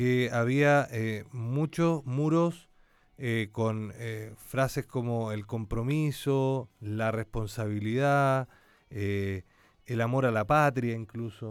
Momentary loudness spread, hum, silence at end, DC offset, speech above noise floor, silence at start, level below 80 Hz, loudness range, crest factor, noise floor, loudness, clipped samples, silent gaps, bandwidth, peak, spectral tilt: 13 LU; none; 0 s; under 0.1%; 33 dB; 0 s; -54 dBFS; 3 LU; 16 dB; -61 dBFS; -29 LUFS; under 0.1%; none; 16 kHz; -12 dBFS; -7 dB/octave